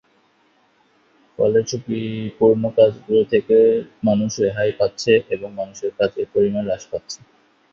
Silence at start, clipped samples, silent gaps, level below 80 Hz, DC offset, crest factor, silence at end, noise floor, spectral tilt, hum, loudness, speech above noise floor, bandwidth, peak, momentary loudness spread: 1.4 s; under 0.1%; none; -56 dBFS; under 0.1%; 18 dB; 0.55 s; -60 dBFS; -5.5 dB/octave; none; -19 LUFS; 41 dB; 7.4 kHz; -2 dBFS; 12 LU